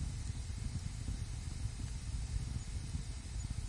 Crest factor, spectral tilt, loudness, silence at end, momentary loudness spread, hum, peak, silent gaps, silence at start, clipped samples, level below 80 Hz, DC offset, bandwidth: 14 dB; -5 dB/octave; -43 LUFS; 0 s; 2 LU; none; -26 dBFS; none; 0 s; under 0.1%; -44 dBFS; under 0.1%; 11.5 kHz